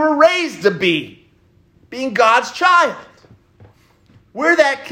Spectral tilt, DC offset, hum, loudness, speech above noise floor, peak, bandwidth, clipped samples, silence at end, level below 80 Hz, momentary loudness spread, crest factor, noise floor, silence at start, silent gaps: -3.5 dB/octave; under 0.1%; none; -15 LUFS; 38 dB; 0 dBFS; 15.5 kHz; under 0.1%; 0 s; -62 dBFS; 21 LU; 16 dB; -54 dBFS; 0 s; none